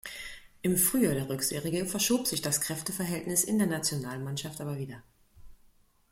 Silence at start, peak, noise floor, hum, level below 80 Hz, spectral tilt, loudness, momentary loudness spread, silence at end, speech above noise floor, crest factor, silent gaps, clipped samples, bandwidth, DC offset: 0.05 s; -12 dBFS; -63 dBFS; none; -60 dBFS; -3.5 dB/octave; -29 LUFS; 14 LU; 0.55 s; 33 dB; 20 dB; none; under 0.1%; 16.5 kHz; under 0.1%